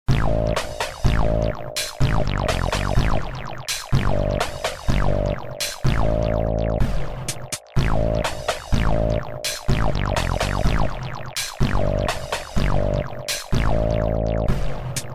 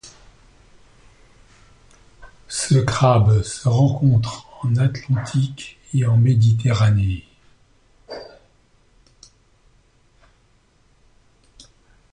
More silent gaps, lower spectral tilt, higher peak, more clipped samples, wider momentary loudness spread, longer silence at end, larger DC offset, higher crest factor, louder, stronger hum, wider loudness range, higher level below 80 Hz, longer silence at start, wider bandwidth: neither; second, -5 dB/octave vs -6.5 dB/octave; about the same, -4 dBFS vs -4 dBFS; neither; second, 5 LU vs 15 LU; second, 0 s vs 3.9 s; neither; about the same, 18 dB vs 18 dB; second, -24 LUFS vs -19 LUFS; neither; second, 1 LU vs 6 LU; first, -26 dBFS vs -44 dBFS; about the same, 0.05 s vs 0.05 s; first, 16 kHz vs 11 kHz